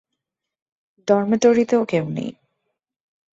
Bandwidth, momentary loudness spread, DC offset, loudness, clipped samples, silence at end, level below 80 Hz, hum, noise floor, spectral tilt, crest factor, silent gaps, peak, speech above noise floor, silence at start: 8 kHz; 14 LU; under 0.1%; -19 LUFS; under 0.1%; 1 s; -64 dBFS; none; -82 dBFS; -6 dB/octave; 18 dB; none; -4 dBFS; 64 dB; 1.05 s